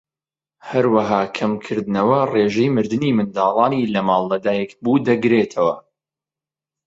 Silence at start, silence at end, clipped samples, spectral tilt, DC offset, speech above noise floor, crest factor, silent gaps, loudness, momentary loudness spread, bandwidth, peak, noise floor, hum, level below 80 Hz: 0.65 s; 1.05 s; under 0.1%; -7 dB/octave; under 0.1%; over 72 dB; 16 dB; none; -18 LUFS; 6 LU; 7.8 kHz; -2 dBFS; under -90 dBFS; none; -60 dBFS